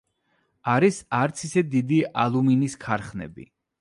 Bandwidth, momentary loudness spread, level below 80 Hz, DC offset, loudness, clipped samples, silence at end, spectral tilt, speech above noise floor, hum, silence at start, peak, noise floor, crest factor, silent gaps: 11.5 kHz; 12 LU; -58 dBFS; under 0.1%; -23 LUFS; under 0.1%; 0.35 s; -6.5 dB/octave; 47 dB; none; 0.65 s; -6 dBFS; -70 dBFS; 18 dB; none